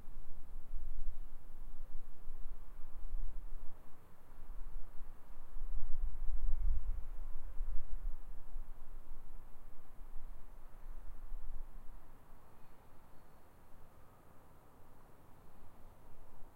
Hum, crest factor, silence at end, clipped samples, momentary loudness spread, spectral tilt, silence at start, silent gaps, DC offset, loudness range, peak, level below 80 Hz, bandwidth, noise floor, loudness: none; 16 dB; 0.05 s; under 0.1%; 17 LU; -7 dB/octave; 0 s; none; under 0.1%; 16 LU; -18 dBFS; -42 dBFS; 1.7 kHz; -55 dBFS; -51 LUFS